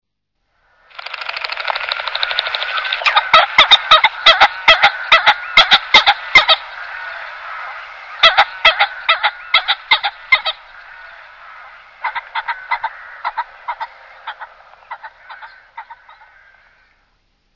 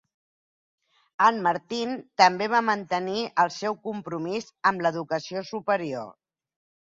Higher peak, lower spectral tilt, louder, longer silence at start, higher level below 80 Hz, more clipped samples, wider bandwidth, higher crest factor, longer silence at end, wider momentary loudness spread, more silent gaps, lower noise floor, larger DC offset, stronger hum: first, 0 dBFS vs -4 dBFS; second, 0 dB/octave vs -4.5 dB/octave; first, -12 LUFS vs -25 LUFS; second, 1 s vs 1.2 s; first, -50 dBFS vs -72 dBFS; first, 0.3% vs under 0.1%; second, 6 kHz vs 7.8 kHz; second, 16 dB vs 22 dB; first, 1.6 s vs 0.75 s; first, 21 LU vs 12 LU; neither; second, -71 dBFS vs under -90 dBFS; neither; neither